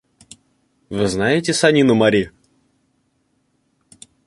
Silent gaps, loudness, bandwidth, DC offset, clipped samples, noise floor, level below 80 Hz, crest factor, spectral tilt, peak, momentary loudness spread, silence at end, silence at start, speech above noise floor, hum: none; -16 LUFS; 11.5 kHz; under 0.1%; under 0.1%; -66 dBFS; -50 dBFS; 18 dB; -5 dB/octave; -2 dBFS; 12 LU; 2 s; 0.9 s; 50 dB; none